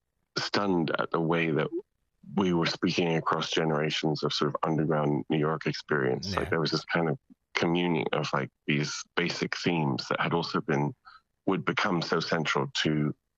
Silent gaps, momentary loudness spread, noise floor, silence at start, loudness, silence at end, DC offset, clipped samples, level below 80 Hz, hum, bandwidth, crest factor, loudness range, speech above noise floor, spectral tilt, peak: none; 5 LU; -52 dBFS; 0.35 s; -29 LUFS; 0.25 s; under 0.1%; under 0.1%; -60 dBFS; none; 8 kHz; 20 dB; 2 LU; 24 dB; -5.5 dB/octave; -10 dBFS